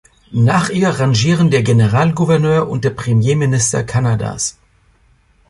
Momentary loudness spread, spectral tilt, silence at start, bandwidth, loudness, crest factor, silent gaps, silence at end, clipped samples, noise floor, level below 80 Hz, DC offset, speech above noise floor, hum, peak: 6 LU; -5.5 dB/octave; 0.3 s; 11.5 kHz; -14 LUFS; 14 dB; none; 1 s; under 0.1%; -53 dBFS; -44 dBFS; under 0.1%; 40 dB; none; -2 dBFS